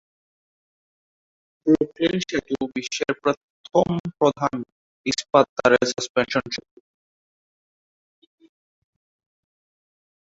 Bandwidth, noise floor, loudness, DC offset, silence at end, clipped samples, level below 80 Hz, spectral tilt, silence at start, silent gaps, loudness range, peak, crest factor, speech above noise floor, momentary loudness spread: 8 kHz; under -90 dBFS; -23 LUFS; under 0.1%; 3.7 s; under 0.1%; -58 dBFS; -4.5 dB/octave; 1.65 s; 3.37-3.64 s, 4.00-4.04 s, 4.72-5.04 s, 5.49-5.56 s, 6.09-6.15 s; 8 LU; -2 dBFS; 24 dB; over 68 dB; 12 LU